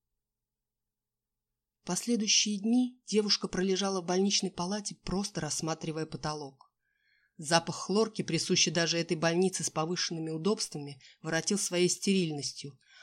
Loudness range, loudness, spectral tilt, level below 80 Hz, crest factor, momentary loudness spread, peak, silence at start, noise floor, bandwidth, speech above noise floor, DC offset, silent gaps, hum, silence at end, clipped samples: 5 LU; -30 LUFS; -3.5 dB/octave; -62 dBFS; 20 dB; 11 LU; -12 dBFS; 1.85 s; -90 dBFS; 14.5 kHz; 59 dB; under 0.1%; none; none; 0.3 s; under 0.1%